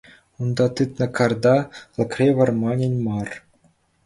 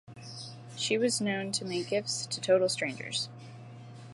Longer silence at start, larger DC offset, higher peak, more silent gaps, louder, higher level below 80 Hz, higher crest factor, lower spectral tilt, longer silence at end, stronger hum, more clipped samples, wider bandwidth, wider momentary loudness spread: first, 0.4 s vs 0.1 s; neither; first, -4 dBFS vs -14 dBFS; neither; first, -21 LUFS vs -30 LUFS; first, -54 dBFS vs -74 dBFS; about the same, 18 dB vs 18 dB; first, -7.5 dB/octave vs -3 dB/octave; first, 0.65 s vs 0 s; neither; neither; about the same, 11.5 kHz vs 11.5 kHz; second, 11 LU vs 21 LU